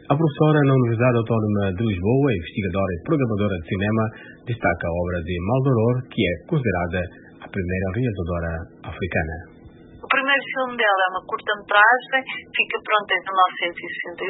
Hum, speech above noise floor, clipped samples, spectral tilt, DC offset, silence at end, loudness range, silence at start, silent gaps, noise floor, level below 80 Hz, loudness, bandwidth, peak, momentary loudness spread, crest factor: none; 23 dB; under 0.1%; -11.5 dB/octave; under 0.1%; 0 s; 6 LU; 0.1 s; none; -45 dBFS; -44 dBFS; -21 LUFS; 4 kHz; -2 dBFS; 10 LU; 20 dB